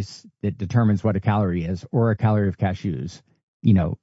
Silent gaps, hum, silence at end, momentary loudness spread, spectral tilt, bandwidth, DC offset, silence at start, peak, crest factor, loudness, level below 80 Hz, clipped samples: 3.43-3.60 s; none; 0.05 s; 10 LU; -8.5 dB/octave; 7.8 kHz; under 0.1%; 0 s; -6 dBFS; 16 dB; -22 LUFS; -48 dBFS; under 0.1%